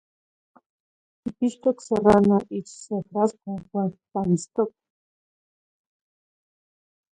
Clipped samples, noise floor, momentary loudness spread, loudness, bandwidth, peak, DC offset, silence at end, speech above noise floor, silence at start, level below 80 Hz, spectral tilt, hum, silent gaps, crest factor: under 0.1%; under -90 dBFS; 16 LU; -24 LUFS; 9.6 kHz; -4 dBFS; under 0.1%; 2.4 s; over 67 dB; 1.25 s; -56 dBFS; -7.5 dB/octave; none; none; 24 dB